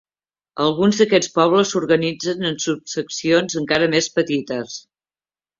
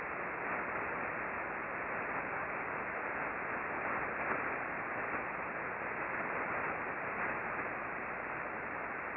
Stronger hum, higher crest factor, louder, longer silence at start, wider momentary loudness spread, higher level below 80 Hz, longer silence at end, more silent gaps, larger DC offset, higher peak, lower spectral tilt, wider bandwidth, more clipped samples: neither; about the same, 18 dB vs 16 dB; first, -19 LUFS vs -38 LUFS; first, 0.55 s vs 0 s; first, 10 LU vs 3 LU; first, -60 dBFS vs -66 dBFS; first, 0.8 s vs 0 s; neither; neither; first, -2 dBFS vs -22 dBFS; about the same, -4 dB/octave vs -4.5 dB/octave; first, 7.6 kHz vs 5.4 kHz; neither